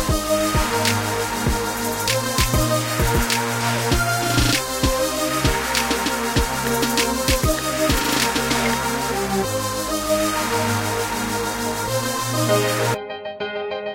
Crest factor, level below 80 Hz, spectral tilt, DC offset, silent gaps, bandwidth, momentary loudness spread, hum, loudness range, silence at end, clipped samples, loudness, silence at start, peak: 16 dB; -32 dBFS; -3.5 dB/octave; under 0.1%; none; 16.5 kHz; 4 LU; none; 2 LU; 0 s; under 0.1%; -20 LUFS; 0 s; -4 dBFS